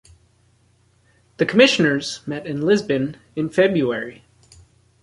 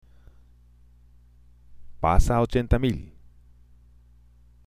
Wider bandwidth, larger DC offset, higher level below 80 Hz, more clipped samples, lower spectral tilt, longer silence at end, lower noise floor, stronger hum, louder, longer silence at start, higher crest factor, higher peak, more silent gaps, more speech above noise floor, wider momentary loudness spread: second, 11.5 kHz vs 14 kHz; neither; second, -58 dBFS vs -32 dBFS; neither; second, -5 dB/octave vs -7 dB/octave; second, 0.9 s vs 1.6 s; first, -59 dBFS vs -55 dBFS; second, none vs 60 Hz at -45 dBFS; first, -19 LUFS vs -24 LUFS; second, 1.4 s vs 1.7 s; about the same, 20 dB vs 24 dB; about the same, 0 dBFS vs -2 dBFS; neither; first, 40 dB vs 35 dB; about the same, 13 LU vs 11 LU